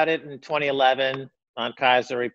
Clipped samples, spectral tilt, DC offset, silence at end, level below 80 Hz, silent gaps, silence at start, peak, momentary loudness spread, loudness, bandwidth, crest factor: under 0.1%; -4.5 dB/octave; under 0.1%; 0.05 s; -72 dBFS; 1.49-1.54 s; 0 s; -6 dBFS; 11 LU; -23 LUFS; 7.8 kHz; 18 dB